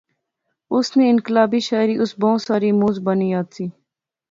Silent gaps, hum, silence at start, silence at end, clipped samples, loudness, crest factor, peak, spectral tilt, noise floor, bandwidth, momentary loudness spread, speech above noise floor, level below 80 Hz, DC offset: none; none; 0.7 s; 0.6 s; under 0.1%; -18 LUFS; 18 dB; -2 dBFS; -6.5 dB/octave; -76 dBFS; 7.6 kHz; 8 LU; 59 dB; -64 dBFS; under 0.1%